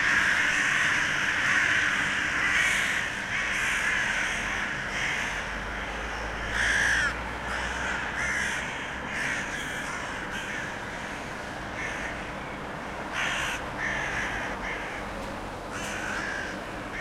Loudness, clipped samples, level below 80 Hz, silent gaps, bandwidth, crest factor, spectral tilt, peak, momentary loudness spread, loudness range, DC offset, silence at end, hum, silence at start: -28 LUFS; under 0.1%; -46 dBFS; none; 16.5 kHz; 18 dB; -2.5 dB/octave; -10 dBFS; 12 LU; 8 LU; under 0.1%; 0 s; none; 0 s